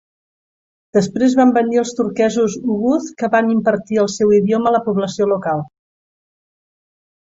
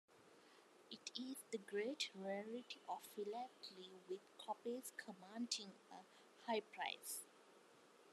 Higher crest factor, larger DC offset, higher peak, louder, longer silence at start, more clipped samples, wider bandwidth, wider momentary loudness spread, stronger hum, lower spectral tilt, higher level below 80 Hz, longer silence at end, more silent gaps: second, 14 dB vs 24 dB; neither; first, -2 dBFS vs -28 dBFS; first, -16 LUFS vs -49 LUFS; first, 0.95 s vs 0.1 s; neither; second, 7.8 kHz vs 13 kHz; second, 6 LU vs 22 LU; neither; first, -6 dB/octave vs -2.5 dB/octave; first, -58 dBFS vs under -90 dBFS; first, 1.55 s vs 0 s; neither